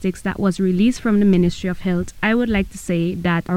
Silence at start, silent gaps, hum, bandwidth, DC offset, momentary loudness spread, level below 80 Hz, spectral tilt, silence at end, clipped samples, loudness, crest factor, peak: 0 s; none; none; 13.5 kHz; under 0.1%; 7 LU; -38 dBFS; -7 dB/octave; 0 s; under 0.1%; -19 LUFS; 12 dB; -6 dBFS